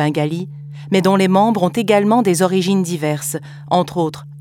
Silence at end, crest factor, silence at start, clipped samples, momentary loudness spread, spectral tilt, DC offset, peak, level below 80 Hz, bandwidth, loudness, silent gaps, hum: 0 s; 14 dB; 0 s; under 0.1%; 11 LU; -5.5 dB/octave; under 0.1%; -2 dBFS; -60 dBFS; 16.5 kHz; -16 LUFS; none; none